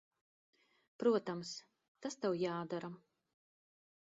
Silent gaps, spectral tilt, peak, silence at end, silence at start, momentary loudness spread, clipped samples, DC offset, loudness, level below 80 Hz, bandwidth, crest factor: 1.88-1.95 s; -5 dB/octave; -20 dBFS; 1.2 s; 1 s; 16 LU; under 0.1%; under 0.1%; -39 LUFS; -86 dBFS; 7.6 kHz; 22 dB